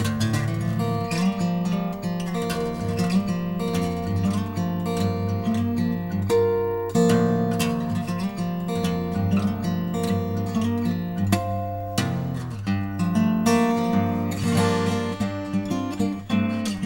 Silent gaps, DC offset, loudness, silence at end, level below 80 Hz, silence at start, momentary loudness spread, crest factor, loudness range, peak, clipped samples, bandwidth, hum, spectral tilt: none; under 0.1%; -24 LUFS; 0 s; -48 dBFS; 0 s; 6 LU; 18 dB; 2 LU; -6 dBFS; under 0.1%; 16.5 kHz; none; -6.5 dB/octave